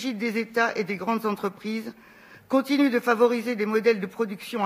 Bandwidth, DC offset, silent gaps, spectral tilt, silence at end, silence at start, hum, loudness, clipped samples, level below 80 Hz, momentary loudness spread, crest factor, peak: 15.5 kHz; under 0.1%; none; -5.5 dB/octave; 0 s; 0 s; none; -25 LUFS; under 0.1%; -76 dBFS; 9 LU; 18 dB; -6 dBFS